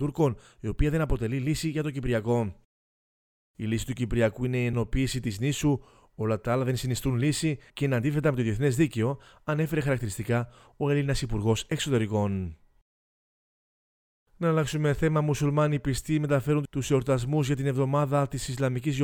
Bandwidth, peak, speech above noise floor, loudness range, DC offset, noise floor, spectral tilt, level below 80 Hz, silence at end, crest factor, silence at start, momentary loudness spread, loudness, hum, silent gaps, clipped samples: 18 kHz; -10 dBFS; over 63 dB; 4 LU; under 0.1%; under -90 dBFS; -6.5 dB/octave; -42 dBFS; 0 s; 18 dB; 0 s; 5 LU; -28 LUFS; none; 2.65-3.54 s, 12.82-14.26 s; under 0.1%